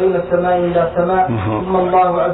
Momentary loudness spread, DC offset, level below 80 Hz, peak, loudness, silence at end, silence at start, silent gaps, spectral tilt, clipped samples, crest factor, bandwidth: 4 LU; under 0.1%; -40 dBFS; -4 dBFS; -15 LUFS; 0 s; 0 s; none; -11.5 dB/octave; under 0.1%; 10 dB; 4.1 kHz